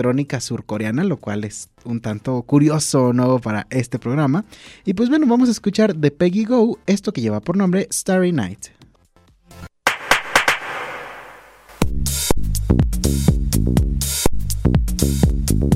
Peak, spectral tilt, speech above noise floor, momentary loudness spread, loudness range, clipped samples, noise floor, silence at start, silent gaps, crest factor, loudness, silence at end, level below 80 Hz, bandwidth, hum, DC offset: -2 dBFS; -5.5 dB/octave; 36 dB; 11 LU; 3 LU; under 0.1%; -54 dBFS; 0 s; none; 16 dB; -19 LUFS; 0 s; -28 dBFS; 16 kHz; none; under 0.1%